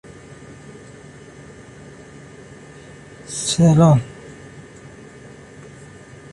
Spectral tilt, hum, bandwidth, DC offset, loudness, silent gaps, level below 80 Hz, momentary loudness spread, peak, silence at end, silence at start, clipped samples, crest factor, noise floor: -6 dB/octave; none; 11.5 kHz; under 0.1%; -16 LUFS; none; -50 dBFS; 27 LU; -4 dBFS; 1.45 s; 3.3 s; under 0.1%; 20 dB; -41 dBFS